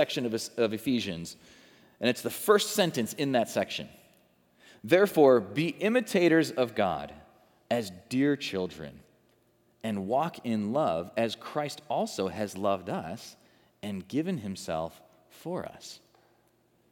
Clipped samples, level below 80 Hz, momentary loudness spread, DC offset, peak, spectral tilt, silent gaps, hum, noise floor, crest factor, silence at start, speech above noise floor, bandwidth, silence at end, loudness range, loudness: under 0.1%; -70 dBFS; 18 LU; under 0.1%; -8 dBFS; -5 dB/octave; none; none; -67 dBFS; 22 dB; 0 s; 39 dB; over 20 kHz; 0.95 s; 9 LU; -29 LUFS